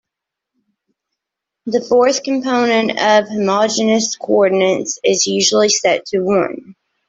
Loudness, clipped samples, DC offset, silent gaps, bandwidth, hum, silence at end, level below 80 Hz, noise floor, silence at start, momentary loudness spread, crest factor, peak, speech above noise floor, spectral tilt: -15 LUFS; under 0.1%; under 0.1%; none; 8.2 kHz; none; 0.35 s; -60 dBFS; -82 dBFS; 1.65 s; 5 LU; 14 dB; -2 dBFS; 67 dB; -3 dB/octave